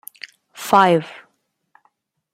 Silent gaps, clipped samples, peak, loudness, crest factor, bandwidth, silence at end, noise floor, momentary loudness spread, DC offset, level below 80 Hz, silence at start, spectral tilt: none; under 0.1%; 0 dBFS; -16 LUFS; 22 dB; 16 kHz; 1.25 s; -67 dBFS; 24 LU; under 0.1%; -66 dBFS; 0.6 s; -5 dB/octave